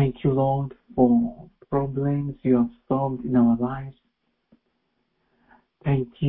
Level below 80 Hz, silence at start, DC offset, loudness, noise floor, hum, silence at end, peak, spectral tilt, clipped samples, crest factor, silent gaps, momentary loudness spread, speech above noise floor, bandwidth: -50 dBFS; 0 s; under 0.1%; -24 LUFS; -73 dBFS; none; 0 s; -6 dBFS; -13.5 dB/octave; under 0.1%; 18 dB; none; 11 LU; 50 dB; 3.8 kHz